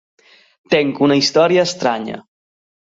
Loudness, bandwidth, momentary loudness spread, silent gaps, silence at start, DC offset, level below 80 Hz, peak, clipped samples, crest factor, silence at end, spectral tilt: -15 LUFS; 7.8 kHz; 13 LU; none; 0.7 s; under 0.1%; -60 dBFS; -2 dBFS; under 0.1%; 16 dB; 0.75 s; -4.5 dB/octave